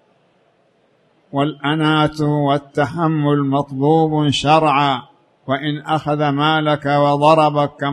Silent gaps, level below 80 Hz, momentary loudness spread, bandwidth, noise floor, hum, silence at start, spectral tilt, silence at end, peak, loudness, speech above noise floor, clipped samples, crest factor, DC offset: none; -52 dBFS; 8 LU; 10.5 kHz; -58 dBFS; none; 1.35 s; -6.5 dB/octave; 0 s; 0 dBFS; -16 LUFS; 43 dB; under 0.1%; 16 dB; under 0.1%